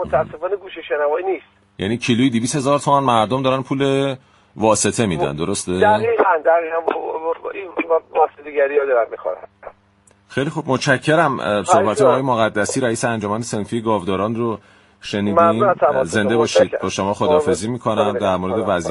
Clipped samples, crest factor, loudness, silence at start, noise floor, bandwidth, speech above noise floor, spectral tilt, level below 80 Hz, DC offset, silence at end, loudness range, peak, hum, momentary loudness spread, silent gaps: under 0.1%; 18 dB; -18 LUFS; 0 s; -55 dBFS; 11.5 kHz; 37 dB; -5 dB/octave; -52 dBFS; under 0.1%; 0 s; 3 LU; 0 dBFS; none; 10 LU; none